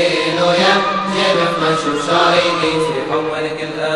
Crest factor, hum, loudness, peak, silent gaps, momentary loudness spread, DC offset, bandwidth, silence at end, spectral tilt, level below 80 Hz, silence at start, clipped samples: 14 dB; none; -15 LUFS; 0 dBFS; none; 7 LU; 0.2%; 11.5 kHz; 0 s; -4 dB/octave; -50 dBFS; 0 s; under 0.1%